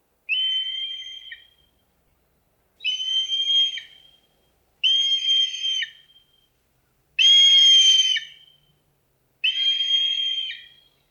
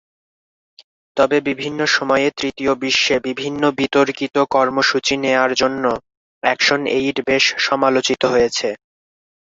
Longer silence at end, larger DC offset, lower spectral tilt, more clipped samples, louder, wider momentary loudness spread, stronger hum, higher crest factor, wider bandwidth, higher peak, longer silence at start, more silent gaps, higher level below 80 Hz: second, 0.5 s vs 0.8 s; neither; second, 5.5 dB/octave vs -3 dB/octave; neither; about the same, -17 LUFS vs -17 LUFS; first, 19 LU vs 7 LU; neither; about the same, 14 dB vs 16 dB; first, 13.5 kHz vs 7.8 kHz; second, -8 dBFS vs -2 dBFS; second, 0.3 s vs 1.15 s; second, none vs 6.17-6.41 s; second, -74 dBFS vs -54 dBFS